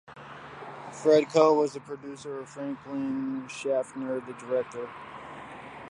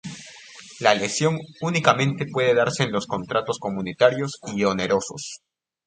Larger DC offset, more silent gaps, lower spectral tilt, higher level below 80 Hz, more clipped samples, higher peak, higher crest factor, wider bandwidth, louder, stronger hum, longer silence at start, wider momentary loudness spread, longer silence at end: neither; neither; about the same, -5.5 dB/octave vs -4.5 dB/octave; second, -70 dBFS vs -60 dBFS; neither; second, -6 dBFS vs 0 dBFS; about the same, 22 dB vs 24 dB; first, 10.5 kHz vs 9.4 kHz; second, -28 LUFS vs -22 LUFS; neither; about the same, 0.1 s vs 0.05 s; first, 21 LU vs 17 LU; second, 0 s vs 0.5 s